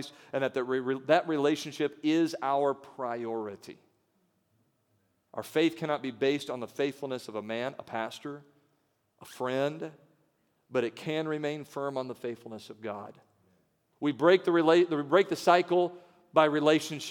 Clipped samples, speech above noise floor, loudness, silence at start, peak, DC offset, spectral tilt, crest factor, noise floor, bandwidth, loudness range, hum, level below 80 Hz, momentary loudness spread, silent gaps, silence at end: under 0.1%; 45 dB; -29 LUFS; 0 s; -8 dBFS; under 0.1%; -5.5 dB/octave; 22 dB; -74 dBFS; 18.5 kHz; 10 LU; none; -84 dBFS; 17 LU; none; 0 s